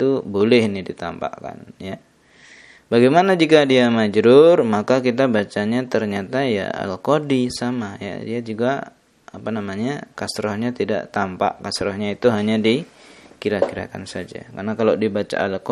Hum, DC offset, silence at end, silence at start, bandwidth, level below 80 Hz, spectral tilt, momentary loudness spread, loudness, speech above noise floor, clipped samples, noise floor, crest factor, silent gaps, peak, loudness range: none; under 0.1%; 0 s; 0 s; 12 kHz; -58 dBFS; -6 dB/octave; 16 LU; -19 LUFS; 30 dB; under 0.1%; -49 dBFS; 20 dB; none; 0 dBFS; 9 LU